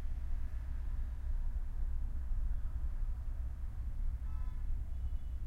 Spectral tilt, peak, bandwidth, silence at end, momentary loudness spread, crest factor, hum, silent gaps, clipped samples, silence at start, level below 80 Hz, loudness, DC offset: -8 dB/octave; -26 dBFS; 2.7 kHz; 0 s; 2 LU; 10 dB; none; none; under 0.1%; 0 s; -36 dBFS; -43 LUFS; under 0.1%